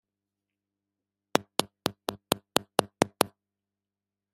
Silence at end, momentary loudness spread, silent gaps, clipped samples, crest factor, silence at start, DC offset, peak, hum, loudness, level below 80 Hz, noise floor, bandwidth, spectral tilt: 1.1 s; 6 LU; none; under 0.1%; 34 dB; 1.35 s; under 0.1%; 0 dBFS; 50 Hz at -60 dBFS; -30 LUFS; -66 dBFS; under -90 dBFS; 16 kHz; -3 dB/octave